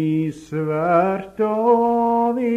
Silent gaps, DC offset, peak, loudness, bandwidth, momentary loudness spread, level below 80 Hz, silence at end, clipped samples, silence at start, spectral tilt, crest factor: none; under 0.1%; -4 dBFS; -19 LUFS; 9.2 kHz; 7 LU; -58 dBFS; 0 s; under 0.1%; 0 s; -9 dB/octave; 16 dB